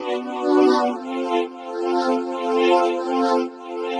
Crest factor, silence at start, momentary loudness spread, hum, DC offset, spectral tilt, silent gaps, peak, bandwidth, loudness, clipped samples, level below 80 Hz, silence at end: 16 dB; 0 s; 10 LU; none; under 0.1%; -3.5 dB/octave; none; -4 dBFS; 10.5 kHz; -21 LUFS; under 0.1%; -72 dBFS; 0 s